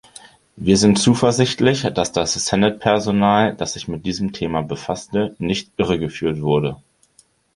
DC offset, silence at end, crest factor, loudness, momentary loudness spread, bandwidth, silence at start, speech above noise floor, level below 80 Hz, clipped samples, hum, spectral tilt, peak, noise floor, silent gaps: under 0.1%; 0.8 s; 18 dB; -19 LUFS; 10 LU; 11.5 kHz; 0.55 s; 39 dB; -46 dBFS; under 0.1%; none; -5 dB/octave; -2 dBFS; -57 dBFS; none